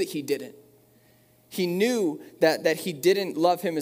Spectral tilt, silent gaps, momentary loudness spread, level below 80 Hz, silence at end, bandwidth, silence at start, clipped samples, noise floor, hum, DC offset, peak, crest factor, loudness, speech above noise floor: -4.5 dB/octave; none; 8 LU; -76 dBFS; 0 s; 16 kHz; 0 s; under 0.1%; -59 dBFS; none; under 0.1%; -8 dBFS; 18 dB; -25 LUFS; 34 dB